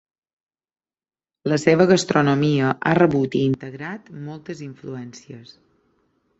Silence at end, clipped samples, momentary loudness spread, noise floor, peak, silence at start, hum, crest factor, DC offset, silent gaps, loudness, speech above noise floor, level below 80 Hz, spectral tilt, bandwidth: 0.95 s; under 0.1%; 19 LU; under -90 dBFS; -2 dBFS; 1.45 s; none; 20 dB; under 0.1%; none; -19 LUFS; over 70 dB; -58 dBFS; -6 dB/octave; 8.2 kHz